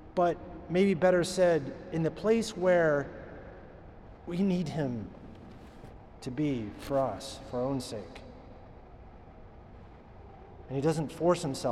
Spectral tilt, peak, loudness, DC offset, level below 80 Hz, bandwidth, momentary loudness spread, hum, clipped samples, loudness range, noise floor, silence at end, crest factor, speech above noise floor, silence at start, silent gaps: -6 dB/octave; -14 dBFS; -30 LUFS; under 0.1%; -54 dBFS; 13.5 kHz; 25 LU; none; under 0.1%; 11 LU; -50 dBFS; 0 s; 18 dB; 21 dB; 0 s; none